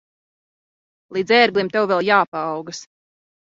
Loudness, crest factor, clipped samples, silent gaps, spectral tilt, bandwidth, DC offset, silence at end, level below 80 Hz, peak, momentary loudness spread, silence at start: -18 LUFS; 20 dB; under 0.1%; 2.28-2.32 s; -4 dB/octave; 7.8 kHz; under 0.1%; 0.65 s; -68 dBFS; -2 dBFS; 15 LU; 1.1 s